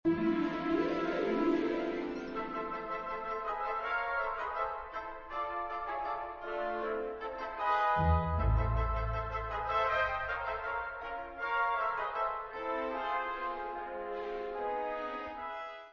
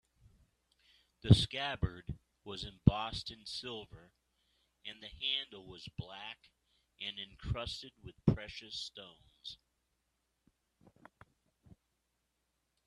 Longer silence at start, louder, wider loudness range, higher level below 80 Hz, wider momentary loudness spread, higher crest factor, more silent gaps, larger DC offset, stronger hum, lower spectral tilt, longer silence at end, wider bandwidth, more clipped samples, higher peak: second, 0.05 s vs 1.25 s; about the same, -35 LUFS vs -37 LUFS; second, 5 LU vs 15 LU; first, -44 dBFS vs -54 dBFS; second, 9 LU vs 19 LU; second, 16 dB vs 30 dB; neither; neither; neither; about the same, -5 dB/octave vs -6 dB/octave; second, 0 s vs 3.3 s; second, 7 kHz vs 11 kHz; neither; second, -18 dBFS vs -8 dBFS